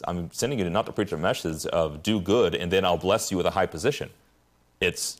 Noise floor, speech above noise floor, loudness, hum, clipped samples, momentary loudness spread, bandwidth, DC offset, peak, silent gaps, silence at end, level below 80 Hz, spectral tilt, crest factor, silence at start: -63 dBFS; 38 dB; -26 LUFS; none; under 0.1%; 6 LU; 15.5 kHz; under 0.1%; -10 dBFS; none; 0.05 s; -54 dBFS; -4.5 dB/octave; 16 dB; 0 s